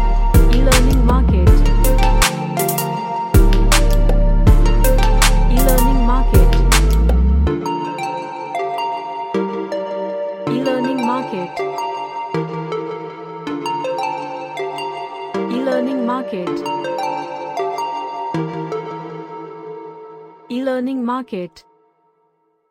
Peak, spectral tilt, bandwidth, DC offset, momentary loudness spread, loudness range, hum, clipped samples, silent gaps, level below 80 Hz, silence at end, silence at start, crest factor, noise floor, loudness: 0 dBFS; -5.5 dB/octave; 16.5 kHz; under 0.1%; 13 LU; 10 LU; none; under 0.1%; none; -18 dBFS; 1.2 s; 0 s; 16 dB; -62 dBFS; -18 LUFS